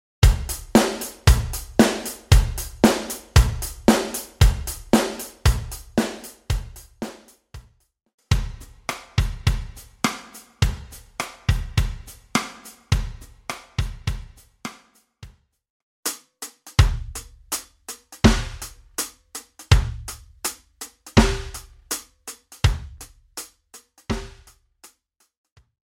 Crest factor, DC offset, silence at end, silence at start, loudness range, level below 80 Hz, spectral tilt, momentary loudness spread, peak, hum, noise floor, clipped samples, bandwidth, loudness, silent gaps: 22 dB; under 0.1%; 1.6 s; 0.2 s; 11 LU; -28 dBFS; -5 dB/octave; 18 LU; -2 dBFS; none; -64 dBFS; under 0.1%; 16.5 kHz; -23 LUFS; 8.14-8.18 s, 15.70-16.03 s